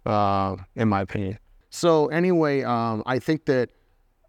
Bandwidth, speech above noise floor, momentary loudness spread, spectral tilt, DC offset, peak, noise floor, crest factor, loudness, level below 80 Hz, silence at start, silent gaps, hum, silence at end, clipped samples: 15.5 kHz; 40 dB; 11 LU; -6.5 dB/octave; under 0.1%; -6 dBFS; -62 dBFS; 18 dB; -24 LUFS; -58 dBFS; 0.05 s; none; none; 0.65 s; under 0.1%